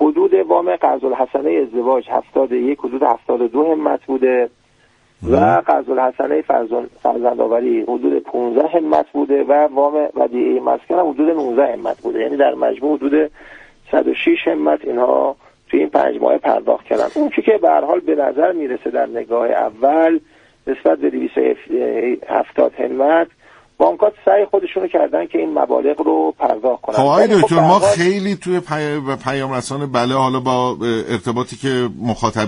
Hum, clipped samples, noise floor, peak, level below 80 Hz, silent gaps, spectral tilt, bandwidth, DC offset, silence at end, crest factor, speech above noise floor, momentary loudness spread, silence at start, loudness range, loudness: none; under 0.1%; -54 dBFS; 0 dBFS; -52 dBFS; none; -6.5 dB/octave; 10 kHz; under 0.1%; 0 s; 16 dB; 39 dB; 7 LU; 0 s; 3 LU; -16 LUFS